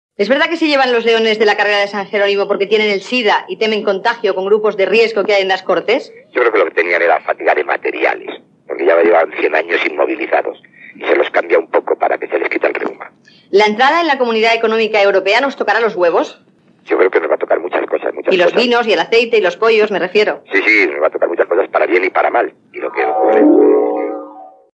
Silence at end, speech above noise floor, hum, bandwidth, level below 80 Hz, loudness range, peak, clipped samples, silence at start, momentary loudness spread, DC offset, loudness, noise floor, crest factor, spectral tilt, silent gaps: 0.25 s; 22 dB; none; 8.2 kHz; -78 dBFS; 3 LU; 0 dBFS; under 0.1%; 0.2 s; 7 LU; under 0.1%; -13 LUFS; -35 dBFS; 14 dB; -4 dB/octave; none